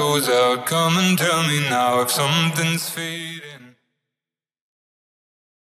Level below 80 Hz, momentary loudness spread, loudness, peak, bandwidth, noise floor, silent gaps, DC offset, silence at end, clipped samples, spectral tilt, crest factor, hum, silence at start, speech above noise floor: -80 dBFS; 10 LU; -19 LUFS; -6 dBFS; 16 kHz; -90 dBFS; none; under 0.1%; 2.1 s; under 0.1%; -3.5 dB/octave; 16 dB; none; 0 s; 70 dB